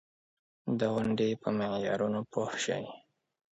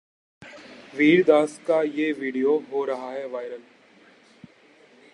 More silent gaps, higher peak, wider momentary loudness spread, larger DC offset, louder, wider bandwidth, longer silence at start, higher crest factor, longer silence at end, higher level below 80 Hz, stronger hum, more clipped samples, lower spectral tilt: neither; second, -16 dBFS vs -4 dBFS; second, 7 LU vs 23 LU; neither; second, -32 LUFS vs -23 LUFS; second, 8.2 kHz vs 11.5 kHz; first, 0.65 s vs 0.4 s; about the same, 18 dB vs 20 dB; second, 0.5 s vs 1.55 s; first, -68 dBFS vs -76 dBFS; neither; neither; about the same, -5.5 dB/octave vs -6 dB/octave